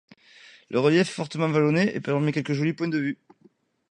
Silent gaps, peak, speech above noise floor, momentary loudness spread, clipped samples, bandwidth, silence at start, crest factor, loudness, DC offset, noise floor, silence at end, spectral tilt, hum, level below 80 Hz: none; -8 dBFS; 37 dB; 7 LU; under 0.1%; 11 kHz; 0.7 s; 18 dB; -24 LUFS; under 0.1%; -61 dBFS; 0.75 s; -6.5 dB/octave; none; -68 dBFS